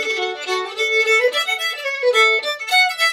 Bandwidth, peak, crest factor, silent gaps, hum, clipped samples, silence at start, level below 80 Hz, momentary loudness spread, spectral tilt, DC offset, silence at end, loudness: 17.5 kHz; -2 dBFS; 16 dB; none; none; under 0.1%; 0 s; -88 dBFS; 8 LU; 1.5 dB/octave; under 0.1%; 0 s; -17 LUFS